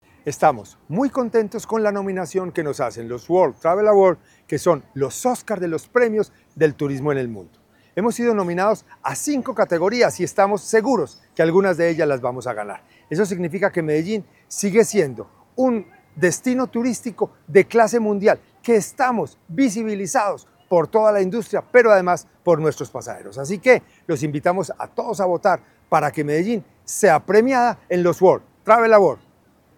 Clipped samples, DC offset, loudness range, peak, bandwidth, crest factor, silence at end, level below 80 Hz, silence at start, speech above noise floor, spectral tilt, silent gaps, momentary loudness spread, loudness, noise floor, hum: under 0.1%; under 0.1%; 4 LU; 0 dBFS; 17 kHz; 20 dB; 0.65 s; -64 dBFS; 0.25 s; 37 dB; -5.5 dB/octave; none; 12 LU; -20 LUFS; -56 dBFS; none